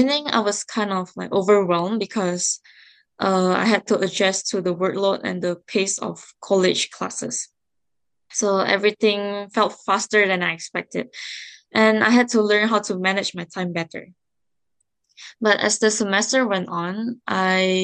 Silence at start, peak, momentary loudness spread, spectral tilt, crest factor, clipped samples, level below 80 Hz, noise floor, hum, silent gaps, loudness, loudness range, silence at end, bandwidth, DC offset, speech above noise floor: 0 s; -2 dBFS; 11 LU; -3.5 dB/octave; 20 dB; under 0.1%; -70 dBFS; -84 dBFS; none; none; -21 LUFS; 4 LU; 0 s; 10 kHz; under 0.1%; 63 dB